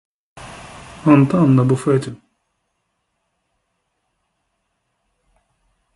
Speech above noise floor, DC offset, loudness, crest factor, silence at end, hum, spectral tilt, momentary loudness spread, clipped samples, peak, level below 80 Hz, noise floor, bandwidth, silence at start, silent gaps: 58 dB; under 0.1%; -15 LUFS; 20 dB; 3.8 s; none; -8.5 dB/octave; 24 LU; under 0.1%; 0 dBFS; -54 dBFS; -72 dBFS; 11.5 kHz; 0.35 s; none